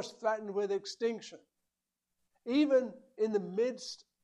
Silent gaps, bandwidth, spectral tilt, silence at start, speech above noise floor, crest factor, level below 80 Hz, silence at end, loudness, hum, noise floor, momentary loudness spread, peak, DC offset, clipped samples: none; 11 kHz; -5 dB/octave; 0 s; 55 dB; 18 dB; -84 dBFS; 0.3 s; -33 LUFS; none; -88 dBFS; 16 LU; -18 dBFS; under 0.1%; under 0.1%